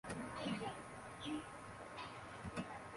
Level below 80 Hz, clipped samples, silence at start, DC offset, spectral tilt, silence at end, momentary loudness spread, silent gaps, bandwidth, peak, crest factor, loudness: -66 dBFS; under 0.1%; 0.05 s; under 0.1%; -5 dB/octave; 0 s; 8 LU; none; 11.5 kHz; -30 dBFS; 16 dB; -48 LUFS